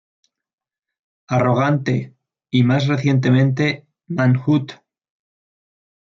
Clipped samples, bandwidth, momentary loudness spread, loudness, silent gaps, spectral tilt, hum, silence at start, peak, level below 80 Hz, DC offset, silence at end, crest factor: under 0.1%; 7.2 kHz; 10 LU; -18 LUFS; none; -7.5 dB/octave; none; 1.3 s; -4 dBFS; -60 dBFS; under 0.1%; 1.4 s; 16 dB